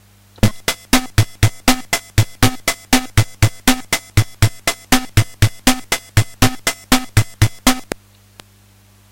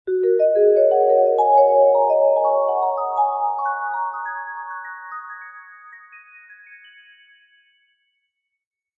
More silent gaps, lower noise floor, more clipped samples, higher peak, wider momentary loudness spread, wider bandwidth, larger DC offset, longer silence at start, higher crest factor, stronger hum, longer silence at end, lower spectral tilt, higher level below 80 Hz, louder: neither; second, -49 dBFS vs -76 dBFS; neither; first, 0 dBFS vs -4 dBFS; second, 4 LU vs 18 LU; first, 17 kHz vs 3.6 kHz; neither; first, 0.45 s vs 0.05 s; about the same, 16 dB vs 16 dB; neither; second, 1.15 s vs 2.25 s; second, -4 dB/octave vs -5.5 dB/octave; first, -28 dBFS vs -76 dBFS; about the same, -17 LUFS vs -18 LUFS